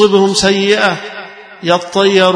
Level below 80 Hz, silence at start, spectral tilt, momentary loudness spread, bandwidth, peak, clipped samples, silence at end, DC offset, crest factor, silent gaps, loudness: -48 dBFS; 0 s; -4 dB/octave; 17 LU; 10.5 kHz; 0 dBFS; 0.1%; 0 s; under 0.1%; 12 dB; none; -12 LUFS